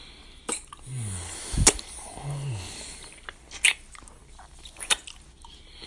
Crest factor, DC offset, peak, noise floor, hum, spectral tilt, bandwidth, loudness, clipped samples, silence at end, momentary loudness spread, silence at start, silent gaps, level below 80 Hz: 30 dB; under 0.1%; 0 dBFS; -48 dBFS; none; -2 dB/octave; 11.5 kHz; -27 LUFS; under 0.1%; 0 s; 26 LU; 0 s; none; -40 dBFS